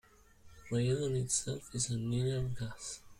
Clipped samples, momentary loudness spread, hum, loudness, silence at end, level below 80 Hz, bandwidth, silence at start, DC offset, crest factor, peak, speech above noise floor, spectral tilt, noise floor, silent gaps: under 0.1%; 9 LU; none; -35 LUFS; 0.05 s; -56 dBFS; 15 kHz; 0.45 s; under 0.1%; 18 dB; -18 dBFS; 25 dB; -5 dB/octave; -60 dBFS; none